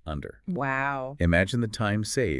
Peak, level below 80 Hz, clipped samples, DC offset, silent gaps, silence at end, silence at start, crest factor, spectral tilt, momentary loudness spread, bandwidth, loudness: -8 dBFS; -46 dBFS; under 0.1%; under 0.1%; none; 0 s; 0.05 s; 18 dB; -5.5 dB/octave; 11 LU; 12 kHz; -27 LUFS